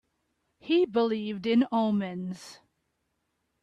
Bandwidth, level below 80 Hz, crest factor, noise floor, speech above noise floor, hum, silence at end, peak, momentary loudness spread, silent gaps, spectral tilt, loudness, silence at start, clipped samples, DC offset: 10.5 kHz; -72 dBFS; 16 dB; -78 dBFS; 51 dB; none; 1.1 s; -14 dBFS; 18 LU; none; -6.5 dB/octave; -27 LUFS; 0.65 s; under 0.1%; under 0.1%